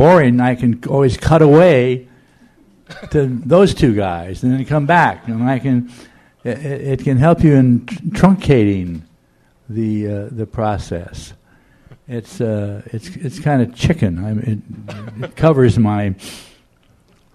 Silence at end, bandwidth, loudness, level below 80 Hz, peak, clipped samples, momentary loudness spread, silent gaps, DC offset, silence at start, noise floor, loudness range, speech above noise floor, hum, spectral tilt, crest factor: 0.9 s; 12.5 kHz; -15 LUFS; -38 dBFS; 0 dBFS; under 0.1%; 18 LU; none; under 0.1%; 0 s; -55 dBFS; 10 LU; 40 dB; none; -8 dB/octave; 16 dB